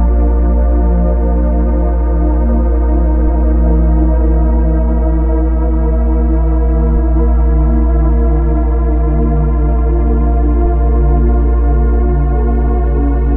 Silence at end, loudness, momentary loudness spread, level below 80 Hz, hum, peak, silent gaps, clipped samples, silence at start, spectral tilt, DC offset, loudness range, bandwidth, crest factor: 0 s; -13 LUFS; 2 LU; -10 dBFS; none; 0 dBFS; none; under 0.1%; 0 s; -12 dB/octave; under 0.1%; 0 LU; 2.3 kHz; 10 dB